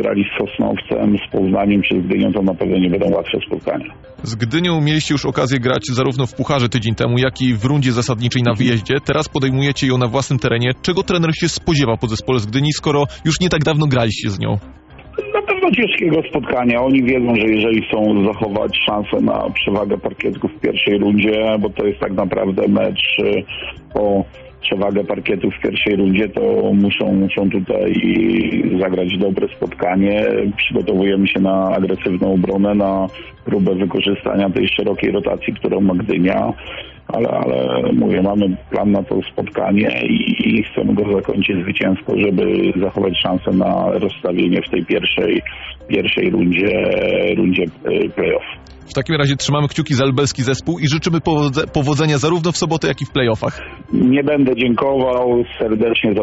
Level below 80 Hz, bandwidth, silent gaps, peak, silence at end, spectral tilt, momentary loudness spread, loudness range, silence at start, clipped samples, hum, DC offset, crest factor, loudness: -42 dBFS; 8 kHz; none; -2 dBFS; 0 s; -5 dB/octave; 6 LU; 2 LU; 0 s; under 0.1%; none; under 0.1%; 14 dB; -16 LUFS